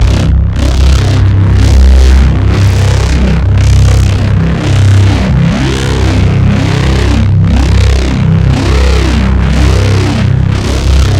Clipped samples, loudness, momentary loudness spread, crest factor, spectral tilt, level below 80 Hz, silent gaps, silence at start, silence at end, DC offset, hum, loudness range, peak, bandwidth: 1%; -8 LUFS; 3 LU; 6 dB; -6.5 dB/octave; -10 dBFS; none; 0 s; 0 s; 0.3%; none; 1 LU; 0 dBFS; 10.5 kHz